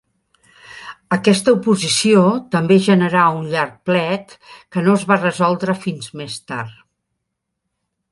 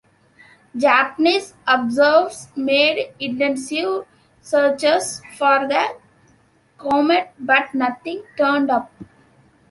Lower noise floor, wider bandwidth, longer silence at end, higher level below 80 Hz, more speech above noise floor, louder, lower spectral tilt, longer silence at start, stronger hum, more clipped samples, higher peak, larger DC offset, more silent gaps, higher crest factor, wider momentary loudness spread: first, -77 dBFS vs -57 dBFS; about the same, 11.5 kHz vs 11.5 kHz; first, 1.4 s vs 0.65 s; about the same, -60 dBFS vs -64 dBFS; first, 60 dB vs 38 dB; about the same, -16 LUFS vs -18 LUFS; first, -5 dB/octave vs -3 dB/octave; about the same, 0.7 s vs 0.75 s; neither; neither; about the same, 0 dBFS vs -2 dBFS; neither; neither; about the same, 18 dB vs 18 dB; first, 15 LU vs 11 LU